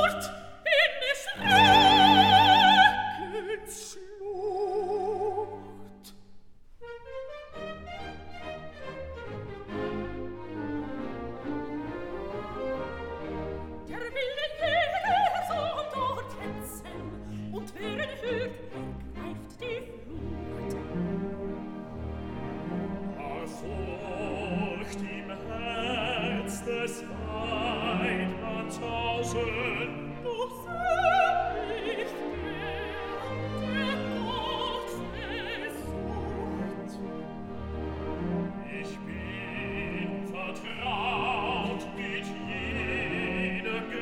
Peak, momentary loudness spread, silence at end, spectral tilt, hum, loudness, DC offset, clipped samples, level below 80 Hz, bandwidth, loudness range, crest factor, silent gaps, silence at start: -6 dBFS; 16 LU; 0 s; -4.5 dB/octave; none; -29 LUFS; under 0.1%; under 0.1%; -48 dBFS; 17.5 kHz; 14 LU; 24 dB; none; 0 s